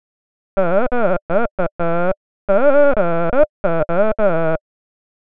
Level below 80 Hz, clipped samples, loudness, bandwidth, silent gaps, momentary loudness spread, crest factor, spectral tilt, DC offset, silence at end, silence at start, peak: -36 dBFS; under 0.1%; -18 LUFS; 4.7 kHz; 1.22-1.29 s, 1.51-1.58 s, 1.72-1.79 s, 2.17-2.48 s, 3.49-3.64 s; 8 LU; 16 dB; -12 dB/octave; 10%; 0.7 s; 0.55 s; 0 dBFS